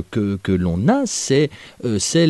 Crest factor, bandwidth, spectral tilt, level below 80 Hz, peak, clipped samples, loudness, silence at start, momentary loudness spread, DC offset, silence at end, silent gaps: 14 dB; 12 kHz; -5 dB/octave; -44 dBFS; -4 dBFS; under 0.1%; -19 LUFS; 0 s; 6 LU; under 0.1%; 0 s; none